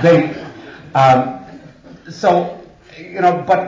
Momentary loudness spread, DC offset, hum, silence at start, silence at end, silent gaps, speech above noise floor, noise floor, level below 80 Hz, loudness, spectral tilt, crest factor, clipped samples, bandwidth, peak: 23 LU; under 0.1%; none; 0 s; 0 s; none; 26 dB; -40 dBFS; -54 dBFS; -15 LUFS; -7 dB/octave; 14 dB; under 0.1%; 7.6 kHz; -2 dBFS